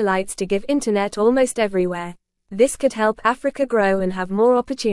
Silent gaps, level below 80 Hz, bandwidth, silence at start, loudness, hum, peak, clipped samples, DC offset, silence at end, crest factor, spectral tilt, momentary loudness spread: none; -50 dBFS; 12 kHz; 0 s; -20 LUFS; none; -4 dBFS; under 0.1%; under 0.1%; 0 s; 16 dB; -5 dB/octave; 6 LU